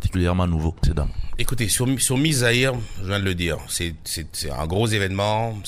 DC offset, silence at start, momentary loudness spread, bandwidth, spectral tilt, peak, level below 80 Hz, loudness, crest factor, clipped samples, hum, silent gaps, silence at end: under 0.1%; 0 s; 9 LU; 16 kHz; -4.5 dB/octave; -4 dBFS; -30 dBFS; -22 LUFS; 18 dB; under 0.1%; none; none; 0 s